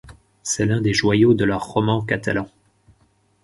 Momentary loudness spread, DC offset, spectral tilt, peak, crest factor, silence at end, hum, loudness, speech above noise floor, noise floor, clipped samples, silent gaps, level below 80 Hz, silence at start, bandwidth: 10 LU; under 0.1%; -5 dB/octave; -4 dBFS; 18 dB; 0.95 s; none; -20 LUFS; 42 dB; -61 dBFS; under 0.1%; none; -48 dBFS; 0.05 s; 11.5 kHz